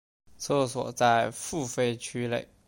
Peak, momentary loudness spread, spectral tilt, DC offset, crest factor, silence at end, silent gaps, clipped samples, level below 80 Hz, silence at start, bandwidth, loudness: -10 dBFS; 9 LU; -4.5 dB/octave; under 0.1%; 18 dB; 0.25 s; none; under 0.1%; -62 dBFS; 0.4 s; 17 kHz; -28 LUFS